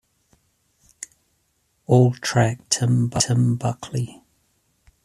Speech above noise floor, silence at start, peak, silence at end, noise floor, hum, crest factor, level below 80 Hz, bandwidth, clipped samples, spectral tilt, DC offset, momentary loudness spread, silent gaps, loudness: 49 dB; 1.9 s; -2 dBFS; 0.95 s; -68 dBFS; none; 20 dB; -56 dBFS; 13 kHz; under 0.1%; -5 dB/octave; under 0.1%; 21 LU; none; -21 LUFS